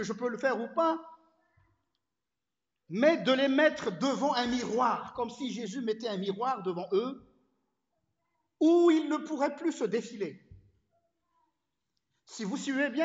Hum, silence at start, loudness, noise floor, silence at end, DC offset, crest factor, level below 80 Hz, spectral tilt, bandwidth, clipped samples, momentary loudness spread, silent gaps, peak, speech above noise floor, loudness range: none; 0 s; -30 LUFS; under -90 dBFS; 0 s; under 0.1%; 20 dB; -72 dBFS; -5 dB/octave; 8 kHz; under 0.1%; 13 LU; none; -12 dBFS; over 61 dB; 7 LU